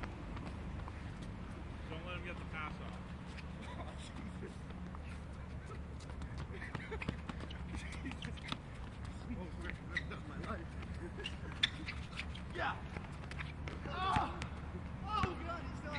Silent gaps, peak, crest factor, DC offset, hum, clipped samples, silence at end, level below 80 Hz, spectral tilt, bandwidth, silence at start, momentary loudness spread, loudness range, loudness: none; -16 dBFS; 28 dB; under 0.1%; none; under 0.1%; 0 s; -50 dBFS; -5.5 dB/octave; 11 kHz; 0 s; 10 LU; 6 LU; -44 LUFS